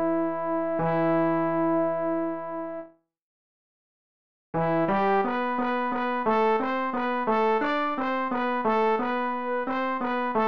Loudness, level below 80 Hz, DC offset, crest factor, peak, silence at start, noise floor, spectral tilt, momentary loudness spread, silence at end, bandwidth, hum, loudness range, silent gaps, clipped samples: -26 LUFS; -64 dBFS; 0.7%; 12 dB; -14 dBFS; 0 s; under -90 dBFS; -8 dB/octave; 5 LU; 0 s; 6.2 kHz; none; 5 LU; 3.22-4.53 s; under 0.1%